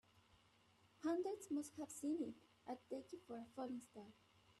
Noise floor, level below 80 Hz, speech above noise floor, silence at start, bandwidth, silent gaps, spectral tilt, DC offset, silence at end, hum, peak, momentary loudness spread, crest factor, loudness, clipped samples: -74 dBFS; -86 dBFS; 26 dB; 0.15 s; 13 kHz; none; -4.5 dB/octave; under 0.1%; 0.1 s; none; -34 dBFS; 14 LU; 16 dB; -48 LUFS; under 0.1%